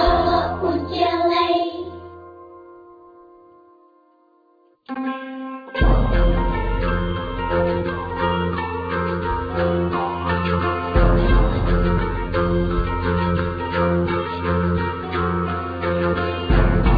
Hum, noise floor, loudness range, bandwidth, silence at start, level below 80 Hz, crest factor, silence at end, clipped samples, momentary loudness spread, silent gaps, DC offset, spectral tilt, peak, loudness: none; -58 dBFS; 9 LU; 5 kHz; 0 s; -26 dBFS; 18 dB; 0 s; under 0.1%; 9 LU; none; under 0.1%; -9 dB/octave; -4 dBFS; -21 LUFS